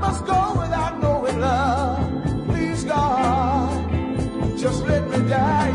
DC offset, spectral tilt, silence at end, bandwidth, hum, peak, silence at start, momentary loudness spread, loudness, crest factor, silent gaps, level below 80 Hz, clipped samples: under 0.1%; -6.5 dB/octave; 0 s; 11 kHz; none; -6 dBFS; 0 s; 5 LU; -21 LUFS; 14 dB; none; -34 dBFS; under 0.1%